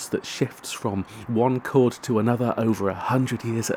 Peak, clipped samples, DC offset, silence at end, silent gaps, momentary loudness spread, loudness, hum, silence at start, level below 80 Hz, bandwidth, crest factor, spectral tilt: -6 dBFS; under 0.1%; under 0.1%; 0 s; none; 7 LU; -24 LUFS; none; 0 s; -60 dBFS; 18 kHz; 18 dB; -6 dB/octave